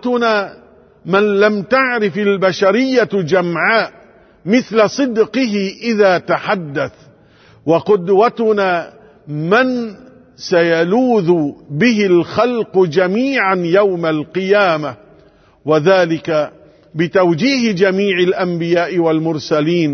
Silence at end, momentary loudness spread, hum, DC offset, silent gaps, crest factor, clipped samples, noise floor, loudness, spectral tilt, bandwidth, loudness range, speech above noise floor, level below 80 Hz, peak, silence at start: 0 s; 9 LU; none; under 0.1%; none; 14 dB; under 0.1%; -48 dBFS; -14 LUFS; -6 dB/octave; 6.6 kHz; 2 LU; 34 dB; -58 dBFS; 0 dBFS; 0 s